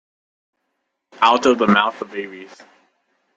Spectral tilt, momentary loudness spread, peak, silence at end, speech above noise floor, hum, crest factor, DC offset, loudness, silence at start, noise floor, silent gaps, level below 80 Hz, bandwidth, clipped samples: -4.5 dB/octave; 18 LU; 0 dBFS; 0.9 s; 57 dB; none; 20 dB; under 0.1%; -17 LUFS; 1.2 s; -75 dBFS; none; -64 dBFS; 7.8 kHz; under 0.1%